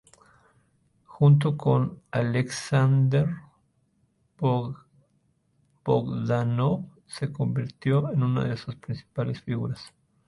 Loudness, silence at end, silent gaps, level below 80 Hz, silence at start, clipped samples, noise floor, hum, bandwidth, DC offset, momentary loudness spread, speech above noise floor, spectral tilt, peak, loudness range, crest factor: -26 LUFS; 0.4 s; none; -58 dBFS; 1.1 s; under 0.1%; -69 dBFS; none; 11.5 kHz; under 0.1%; 14 LU; 44 dB; -7.5 dB/octave; -10 dBFS; 5 LU; 18 dB